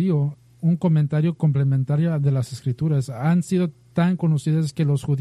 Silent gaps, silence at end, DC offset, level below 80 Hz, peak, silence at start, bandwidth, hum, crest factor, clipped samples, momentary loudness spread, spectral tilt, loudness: none; 0 s; under 0.1%; -58 dBFS; -10 dBFS; 0 s; 11.5 kHz; none; 10 dB; under 0.1%; 5 LU; -8.5 dB/octave; -22 LUFS